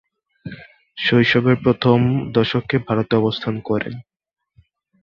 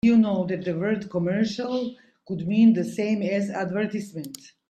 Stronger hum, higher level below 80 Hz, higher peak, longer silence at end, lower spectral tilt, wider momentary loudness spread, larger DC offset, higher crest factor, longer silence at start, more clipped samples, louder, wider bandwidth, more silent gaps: neither; first, -50 dBFS vs -62 dBFS; first, -2 dBFS vs -8 dBFS; first, 1 s vs 0.35 s; about the same, -8 dB/octave vs -7 dB/octave; first, 21 LU vs 15 LU; neither; about the same, 18 dB vs 16 dB; first, 0.45 s vs 0.05 s; neither; first, -18 LUFS vs -24 LUFS; second, 6.8 kHz vs 12.5 kHz; neither